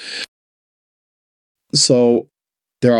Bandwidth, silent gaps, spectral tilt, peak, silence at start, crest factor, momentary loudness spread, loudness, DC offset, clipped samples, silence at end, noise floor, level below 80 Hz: 11.5 kHz; 0.28-1.55 s; -4 dB/octave; -2 dBFS; 0 s; 16 dB; 16 LU; -15 LUFS; under 0.1%; under 0.1%; 0 s; -87 dBFS; -60 dBFS